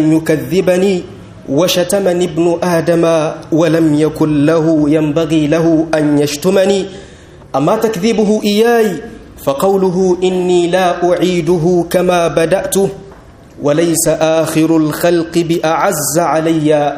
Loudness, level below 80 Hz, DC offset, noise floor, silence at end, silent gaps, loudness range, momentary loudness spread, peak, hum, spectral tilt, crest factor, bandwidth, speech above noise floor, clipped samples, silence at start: -12 LUFS; -44 dBFS; under 0.1%; -37 dBFS; 0 s; none; 2 LU; 5 LU; 0 dBFS; none; -5.5 dB/octave; 12 dB; 15.5 kHz; 25 dB; under 0.1%; 0 s